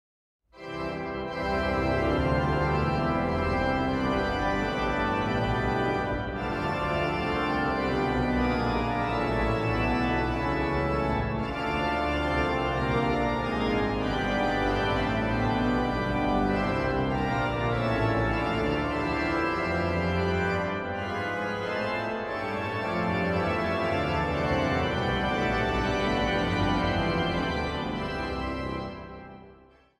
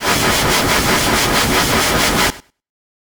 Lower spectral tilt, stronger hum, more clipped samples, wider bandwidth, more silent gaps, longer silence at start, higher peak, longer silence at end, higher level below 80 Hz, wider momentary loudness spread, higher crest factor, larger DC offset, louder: first, -7 dB/octave vs -2.5 dB/octave; neither; neither; second, 13 kHz vs over 20 kHz; neither; first, 0.55 s vs 0 s; second, -12 dBFS vs 0 dBFS; second, 0.45 s vs 0.7 s; second, -38 dBFS vs -30 dBFS; first, 5 LU vs 1 LU; about the same, 14 dB vs 16 dB; neither; second, -27 LUFS vs -13 LUFS